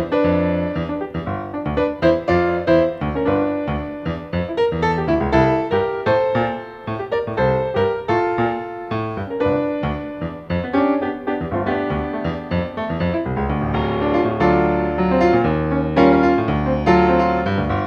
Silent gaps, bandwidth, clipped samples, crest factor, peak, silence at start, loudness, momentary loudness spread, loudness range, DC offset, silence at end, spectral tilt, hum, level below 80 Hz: none; 7 kHz; under 0.1%; 18 dB; -2 dBFS; 0 s; -19 LUFS; 9 LU; 5 LU; under 0.1%; 0 s; -8.5 dB/octave; none; -36 dBFS